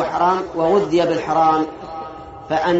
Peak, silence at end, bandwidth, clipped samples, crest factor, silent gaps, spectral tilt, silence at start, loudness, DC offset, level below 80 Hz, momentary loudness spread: -4 dBFS; 0 s; 8 kHz; under 0.1%; 14 dB; none; -4.5 dB/octave; 0 s; -18 LUFS; under 0.1%; -50 dBFS; 15 LU